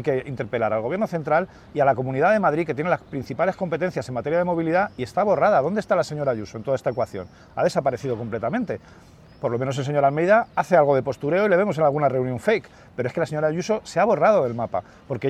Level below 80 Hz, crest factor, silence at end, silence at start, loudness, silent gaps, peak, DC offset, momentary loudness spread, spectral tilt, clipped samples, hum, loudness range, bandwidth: -58 dBFS; 16 dB; 0 s; 0 s; -22 LUFS; none; -6 dBFS; under 0.1%; 10 LU; -7 dB/octave; under 0.1%; none; 5 LU; 13 kHz